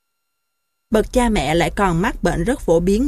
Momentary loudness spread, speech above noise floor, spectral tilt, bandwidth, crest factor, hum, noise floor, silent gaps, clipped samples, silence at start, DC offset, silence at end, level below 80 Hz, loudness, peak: 4 LU; 58 dB; -5.5 dB/octave; 15 kHz; 16 dB; none; -75 dBFS; none; under 0.1%; 0.9 s; under 0.1%; 0 s; -30 dBFS; -18 LUFS; -2 dBFS